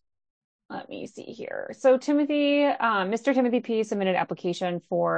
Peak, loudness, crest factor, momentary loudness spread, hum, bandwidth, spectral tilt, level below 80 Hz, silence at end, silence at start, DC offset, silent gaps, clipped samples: -10 dBFS; -25 LUFS; 16 dB; 16 LU; none; 8.8 kHz; -5.5 dB/octave; -78 dBFS; 0 s; 0.7 s; under 0.1%; none; under 0.1%